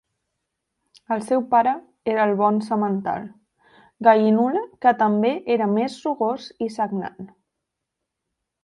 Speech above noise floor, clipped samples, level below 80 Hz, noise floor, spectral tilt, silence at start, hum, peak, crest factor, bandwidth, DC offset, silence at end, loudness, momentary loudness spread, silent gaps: 61 dB; under 0.1%; -68 dBFS; -82 dBFS; -7 dB/octave; 1.1 s; none; -2 dBFS; 20 dB; 11.5 kHz; under 0.1%; 1.4 s; -21 LUFS; 11 LU; none